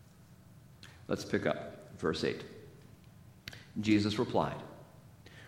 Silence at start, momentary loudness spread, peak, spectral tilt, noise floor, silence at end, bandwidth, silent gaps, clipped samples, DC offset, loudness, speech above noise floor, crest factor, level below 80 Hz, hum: 0.2 s; 25 LU; -14 dBFS; -6 dB/octave; -58 dBFS; 0 s; 16.5 kHz; none; under 0.1%; under 0.1%; -34 LUFS; 25 dB; 22 dB; -64 dBFS; none